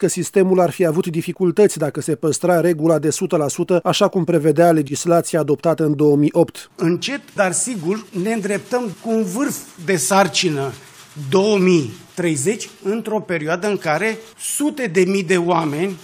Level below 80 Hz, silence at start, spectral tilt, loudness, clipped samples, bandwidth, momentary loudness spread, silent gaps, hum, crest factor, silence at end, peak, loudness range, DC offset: -66 dBFS; 0 s; -5 dB/octave; -18 LUFS; under 0.1%; 20 kHz; 9 LU; none; none; 16 dB; 0 s; -2 dBFS; 4 LU; under 0.1%